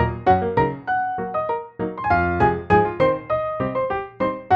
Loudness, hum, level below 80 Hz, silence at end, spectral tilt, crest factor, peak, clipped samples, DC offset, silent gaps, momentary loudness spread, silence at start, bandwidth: -21 LUFS; none; -40 dBFS; 0 s; -9 dB/octave; 18 dB; -4 dBFS; under 0.1%; under 0.1%; none; 8 LU; 0 s; 7 kHz